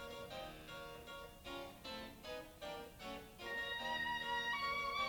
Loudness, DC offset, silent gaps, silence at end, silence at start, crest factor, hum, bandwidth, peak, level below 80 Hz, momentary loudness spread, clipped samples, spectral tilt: -44 LUFS; under 0.1%; none; 0 s; 0 s; 16 dB; none; over 20 kHz; -30 dBFS; -64 dBFS; 12 LU; under 0.1%; -3 dB/octave